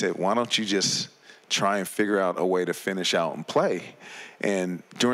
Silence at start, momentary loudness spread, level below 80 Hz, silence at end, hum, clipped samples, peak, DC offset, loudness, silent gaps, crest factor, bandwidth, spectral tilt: 0 s; 9 LU; -78 dBFS; 0 s; none; under 0.1%; -12 dBFS; under 0.1%; -25 LUFS; none; 14 dB; 16 kHz; -3.5 dB/octave